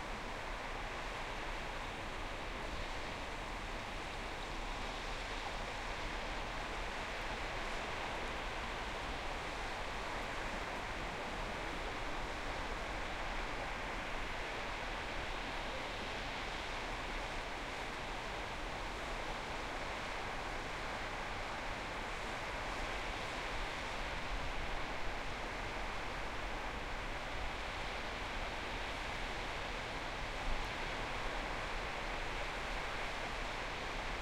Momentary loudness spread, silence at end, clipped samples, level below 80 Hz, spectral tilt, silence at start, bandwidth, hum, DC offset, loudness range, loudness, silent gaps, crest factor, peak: 2 LU; 0 s; under 0.1%; -48 dBFS; -3.5 dB/octave; 0 s; 16 kHz; none; under 0.1%; 2 LU; -42 LUFS; none; 16 dB; -26 dBFS